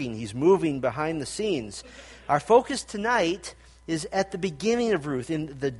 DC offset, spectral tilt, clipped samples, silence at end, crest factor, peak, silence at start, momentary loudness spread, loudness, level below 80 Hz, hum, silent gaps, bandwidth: under 0.1%; -5 dB/octave; under 0.1%; 0 s; 20 dB; -6 dBFS; 0 s; 16 LU; -26 LUFS; -54 dBFS; none; none; 11.5 kHz